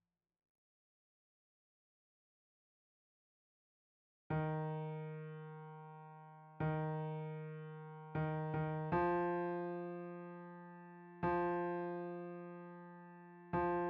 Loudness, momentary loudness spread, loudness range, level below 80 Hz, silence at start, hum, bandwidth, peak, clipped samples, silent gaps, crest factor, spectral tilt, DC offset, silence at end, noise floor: -42 LUFS; 18 LU; 6 LU; -68 dBFS; 4.3 s; none; 4.8 kHz; -24 dBFS; under 0.1%; none; 18 dB; -8 dB/octave; under 0.1%; 0 s; under -90 dBFS